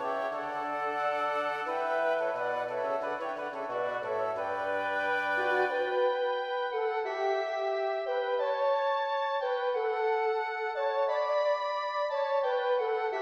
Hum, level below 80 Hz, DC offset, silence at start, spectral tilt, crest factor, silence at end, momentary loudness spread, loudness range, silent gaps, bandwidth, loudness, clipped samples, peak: none; -78 dBFS; under 0.1%; 0 s; -3.5 dB/octave; 12 dB; 0 s; 4 LU; 2 LU; none; 11.5 kHz; -31 LUFS; under 0.1%; -18 dBFS